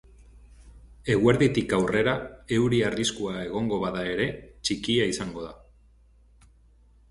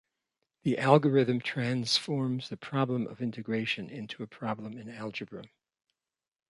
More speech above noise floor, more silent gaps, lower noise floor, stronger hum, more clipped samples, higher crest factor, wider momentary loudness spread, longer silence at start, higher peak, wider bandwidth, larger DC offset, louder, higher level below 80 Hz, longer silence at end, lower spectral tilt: second, 32 dB vs over 60 dB; neither; second, -57 dBFS vs under -90 dBFS; neither; neither; about the same, 22 dB vs 26 dB; second, 10 LU vs 17 LU; second, 0.2 s vs 0.65 s; about the same, -6 dBFS vs -6 dBFS; about the same, 11.5 kHz vs 11.5 kHz; neither; first, -26 LUFS vs -30 LUFS; first, -50 dBFS vs -72 dBFS; first, 1.55 s vs 1.05 s; about the same, -5 dB/octave vs -5.5 dB/octave